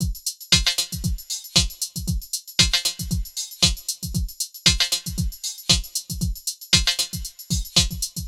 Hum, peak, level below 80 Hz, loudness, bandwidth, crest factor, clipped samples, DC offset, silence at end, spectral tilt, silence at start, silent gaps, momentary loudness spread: none; -2 dBFS; -32 dBFS; -21 LUFS; 17 kHz; 22 dB; under 0.1%; under 0.1%; 0 s; -2 dB/octave; 0 s; none; 11 LU